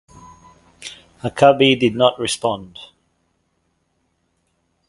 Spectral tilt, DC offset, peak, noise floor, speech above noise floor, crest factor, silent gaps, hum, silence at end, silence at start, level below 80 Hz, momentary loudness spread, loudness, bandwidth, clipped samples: -4.5 dB/octave; under 0.1%; 0 dBFS; -68 dBFS; 51 dB; 20 dB; none; none; 2.05 s; 0.8 s; -56 dBFS; 23 LU; -16 LUFS; 11.5 kHz; under 0.1%